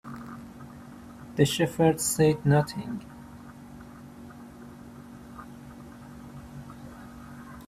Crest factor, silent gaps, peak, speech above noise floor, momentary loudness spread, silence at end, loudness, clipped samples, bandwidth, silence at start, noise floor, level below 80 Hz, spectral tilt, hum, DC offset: 22 dB; none; -8 dBFS; 22 dB; 23 LU; 0.05 s; -25 LUFS; under 0.1%; 15.5 kHz; 0.05 s; -46 dBFS; -56 dBFS; -5.5 dB/octave; none; under 0.1%